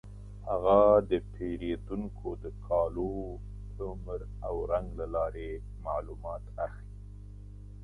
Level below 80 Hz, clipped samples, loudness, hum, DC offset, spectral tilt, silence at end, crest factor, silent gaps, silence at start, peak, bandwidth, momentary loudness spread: -44 dBFS; under 0.1%; -32 LUFS; 50 Hz at -40 dBFS; under 0.1%; -9 dB/octave; 0 s; 22 dB; none; 0.05 s; -10 dBFS; 10 kHz; 23 LU